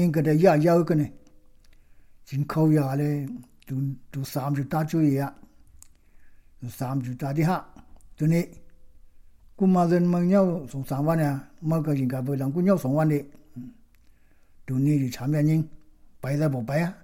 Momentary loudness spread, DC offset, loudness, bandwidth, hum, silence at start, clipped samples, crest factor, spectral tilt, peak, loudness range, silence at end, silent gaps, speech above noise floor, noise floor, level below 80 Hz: 14 LU; under 0.1%; -25 LUFS; 17 kHz; none; 0 s; under 0.1%; 20 dB; -8.5 dB/octave; -6 dBFS; 6 LU; 0.1 s; none; 31 dB; -55 dBFS; -56 dBFS